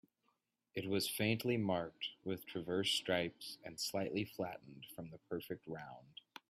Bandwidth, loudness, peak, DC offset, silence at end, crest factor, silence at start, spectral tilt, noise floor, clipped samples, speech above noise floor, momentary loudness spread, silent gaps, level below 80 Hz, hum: 15.5 kHz; -40 LUFS; -20 dBFS; under 0.1%; 0.4 s; 20 dB; 0.75 s; -4 dB/octave; -83 dBFS; under 0.1%; 42 dB; 16 LU; none; -76 dBFS; none